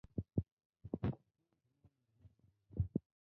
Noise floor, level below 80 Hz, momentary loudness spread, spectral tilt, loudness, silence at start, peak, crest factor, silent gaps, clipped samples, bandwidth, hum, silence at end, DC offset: -83 dBFS; -56 dBFS; 15 LU; -10.5 dB/octave; -44 LUFS; 0.15 s; -24 dBFS; 22 dB; 0.52-0.57 s, 0.65-0.73 s; under 0.1%; 4.3 kHz; none; 0.25 s; under 0.1%